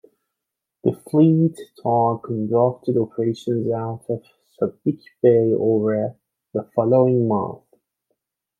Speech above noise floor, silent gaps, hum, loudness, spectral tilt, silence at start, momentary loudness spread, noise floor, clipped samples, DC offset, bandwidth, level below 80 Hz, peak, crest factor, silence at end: 64 dB; none; none; -21 LUFS; -10 dB/octave; 0.85 s; 12 LU; -83 dBFS; under 0.1%; under 0.1%; 11.5 kHz; -66 dBFS; -4 dBFS; 18 dB; 1.05 s